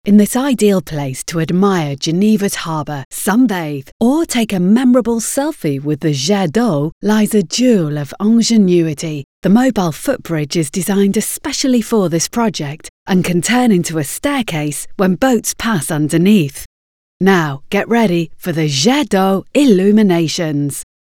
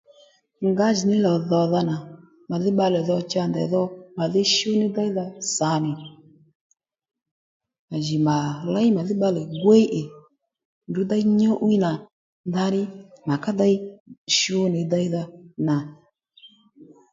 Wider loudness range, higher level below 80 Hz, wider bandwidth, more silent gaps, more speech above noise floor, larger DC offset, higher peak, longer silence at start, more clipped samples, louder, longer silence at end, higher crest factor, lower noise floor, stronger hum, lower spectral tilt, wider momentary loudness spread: second, 2 LU vs 5 LU; first, -46 dBFS vs -66 dBFS; first, 17.5 kHz vs 7.8 kHz; about the same, 3.05-3.11 s, 3.92-4.00 s, 6.92-7.01 s, 9.24-9.42 s, 12.89-13.06 s, 16.66-17.20 s vs 6.55-6.70 s, 7.31-7.60 s, 7.79-7.88 s, 10.65-10.81 s, 12.13-12.44 s, 14.00-14.06 s, 14.18-14.26 s; first, over 76 dB vs 34 dB; neither; first, 0 dBFS vs -4 dBFS; second, 0.05 s vs 0.6 s; neither; first, -14 LUFS vs -22 LUFS; about the same, 0.25 s vs 0.3 s; about the same, 14 dB vs 18 dB; first, under -90 dBFS vs -56 dBFS; neither; about the same, -5 dB/octave vs -5.5 dB/octave; about the same, 9 LU vs 11 LU